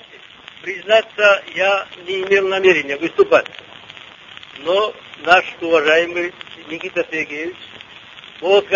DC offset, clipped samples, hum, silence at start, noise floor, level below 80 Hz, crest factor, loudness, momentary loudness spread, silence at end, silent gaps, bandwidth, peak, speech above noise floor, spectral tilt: under 0.1%; under 0.1%; none; 0.15 s; -41 dBFS; -60 dBFS; 18 dB; -17 LUFS; 23 LU; 0 s; none; 7.4 kHz; 0 dBFS; 24 dB; -3.5 dB/octave